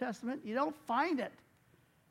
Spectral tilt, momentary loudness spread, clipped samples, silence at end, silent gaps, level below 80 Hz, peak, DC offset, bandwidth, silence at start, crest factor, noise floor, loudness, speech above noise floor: -5.5 dB/octave; 7 LU; under 0.1%; 0.8 s; none; -82 dBFS; -20 dBFS; under 0.1%; 16 kHz; 0 s; 18 dB; -68 dBFS; -36 LUFS; 32 dB